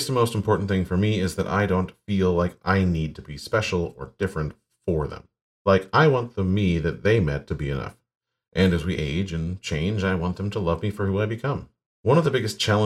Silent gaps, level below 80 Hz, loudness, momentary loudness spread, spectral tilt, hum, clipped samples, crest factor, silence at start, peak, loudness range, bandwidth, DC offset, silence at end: 5.42-5.65 s, 8.15-8.20 s, 11.86-12.04 s; -42 dBFS; -24 LUFS; 10 LU; -6.5 dB/octave; none; under 0.1%; 18 dB; 0 s; -6 dBFS; 3 LU; 14 kHz; under 0.1%; 0 s